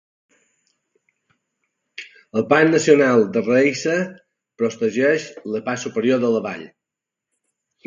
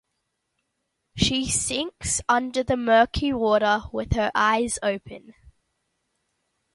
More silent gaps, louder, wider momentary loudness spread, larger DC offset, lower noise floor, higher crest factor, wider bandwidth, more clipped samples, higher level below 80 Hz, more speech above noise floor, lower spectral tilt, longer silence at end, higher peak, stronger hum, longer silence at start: neither; first, -19 LUFS vs -23 LUFS; first, 17 LU vs 8 LU; neither; first, -85 dBFS vs -77 dBFS; about the same, 20 dB vs 20 dB; second, 7.6 kHz vs 11.5 kHz; neither; second, -68 dBFS vs -42 dBFS; first, 67 dB vs 54 dB; first, -5 dB/octave vs -3.5 dB/octave; second, 1.2 s vs 1.45 s; first, 0 dBFS vs -6 dBFS; neither; first, 2 s vs 1.15 s